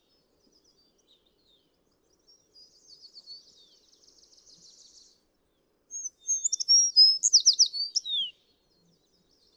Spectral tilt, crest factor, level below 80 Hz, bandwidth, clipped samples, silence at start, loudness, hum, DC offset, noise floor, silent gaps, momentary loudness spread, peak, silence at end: 5 dB/octave; 20 dB; -80 dBFS; 16 kHz; under 0.1%; 3.3 s; -21 LUFS; none; under 0.1%; -72 dBFS; none; 21 LU; -10 dBFS; 1.25 s